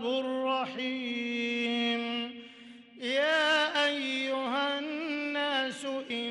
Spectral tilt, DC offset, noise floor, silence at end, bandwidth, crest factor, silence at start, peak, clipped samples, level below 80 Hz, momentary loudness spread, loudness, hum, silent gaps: -2.5 dB/octave; under 0.1%; -51 dBFS; 0 s; 12 kHz; 14 dB; 0 s; -18 dBFS; under 0.1%; -78 dBFS; 10 LU; -30 LUFS; none; none